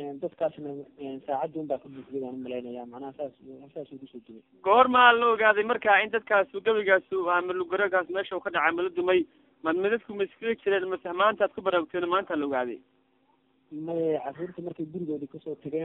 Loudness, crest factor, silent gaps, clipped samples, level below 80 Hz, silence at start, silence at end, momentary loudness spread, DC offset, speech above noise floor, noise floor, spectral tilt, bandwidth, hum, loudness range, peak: -26 LUFS; 24 dB; none; under 0.1%; -70 dBFS; 0 s; 0 s; 18 LU; under 0.1%; 41 dB; -68 dBFS; -7 dB/octave; 4.1 kHz; none; 13 LU; -4 dBFS